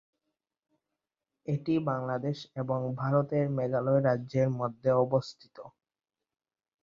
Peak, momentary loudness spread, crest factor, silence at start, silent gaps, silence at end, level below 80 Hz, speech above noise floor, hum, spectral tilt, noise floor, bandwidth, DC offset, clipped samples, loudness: -14 dBFS; 10 LU; 18 dB; 1.45 s; none; 1.15 s; -68 dBFS; over 61 dB; none; -8.5 dB/octave; under -90 dBFS; 7.4 kHz; under 0.1%; under 0.1%; -30 LUFS